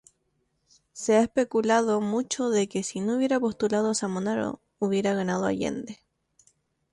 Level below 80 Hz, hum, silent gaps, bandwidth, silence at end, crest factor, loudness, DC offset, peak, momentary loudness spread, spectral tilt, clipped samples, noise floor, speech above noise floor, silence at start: -64 dBFS; none; none; 11.5 kHz; 1 s; 18 dB; -26 LUFS; under 0.1%; -10 dBFS; 9 LU; -5 dB/octave; under 0.1%; -74 dBFS; 48 dB; 0.95 s